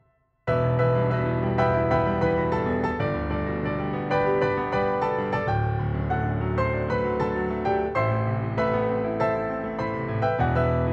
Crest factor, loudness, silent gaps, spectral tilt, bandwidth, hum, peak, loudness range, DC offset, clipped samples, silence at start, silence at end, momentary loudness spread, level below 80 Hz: 14 dB; -25 LUFS; none; -9 dB/octave; 6.6 kHz; none; -10 dBFS; 2 LU; under 0.1%; under 0.1%; 0.45 s; 0 s; 5 LU; -40 dBFS